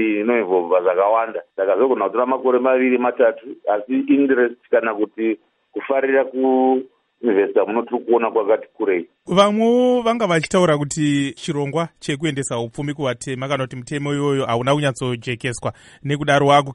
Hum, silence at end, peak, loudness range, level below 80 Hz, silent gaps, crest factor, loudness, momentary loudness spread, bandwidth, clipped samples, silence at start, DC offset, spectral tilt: none; 0 s; 0 dBFS; 4 LU; -56 dBFS; none; 18 dB; -19 LUFS; 9 LU; 11.5 kHz; under 0.1%; 0 s; under 0.1%; -5.5 dB/octave